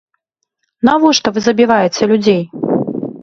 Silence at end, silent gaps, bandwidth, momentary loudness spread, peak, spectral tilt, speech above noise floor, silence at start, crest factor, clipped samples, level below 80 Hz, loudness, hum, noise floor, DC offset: 0.05 s; none; 7.6 kHz; 6 LU; 0 dBFS; -4.5 dB/octave; 59 dB; 0.85 s; 14 dB; under 0.1%; -54 dBFS; -13 LUFS; none; -70 dBFS; under 0.1%